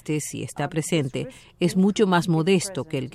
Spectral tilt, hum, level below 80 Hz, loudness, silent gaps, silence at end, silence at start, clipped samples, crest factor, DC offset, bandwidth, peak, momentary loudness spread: -5.5 dB/octave; none; -56 dBFS; -23 LUFS; none; 0.05 s; 0.05 s; under 0.1%; 16 dB; under 0.1%; 14.5 kHz; -6 dBFS; 10 LU